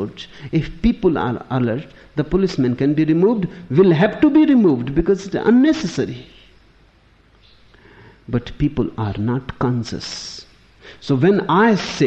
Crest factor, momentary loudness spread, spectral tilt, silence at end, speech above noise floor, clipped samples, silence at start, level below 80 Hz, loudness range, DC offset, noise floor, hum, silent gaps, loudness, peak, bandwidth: 16 dB; 14 LU; -7 dB/octave; 0 s; 35 dB; under 0.1%; 0 s; -40 dBFS; 10 LU; under 0.1%; -53 dBFS; none; none; -18 LUFS; -2 dBFS; 8.2 kHz